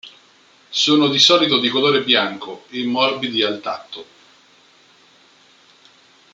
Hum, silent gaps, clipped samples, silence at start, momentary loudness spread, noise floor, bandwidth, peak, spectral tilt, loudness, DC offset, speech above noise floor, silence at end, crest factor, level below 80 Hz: none; none; under 0.1%; 0.05 s; 18 LU; -52 dBFS; 9.2 kHz; 0 dBFS; -3 dB/octave; -16 LUFS; under 0.1%; 35 dB; 2.3 s; 20 dB; -68 dBFS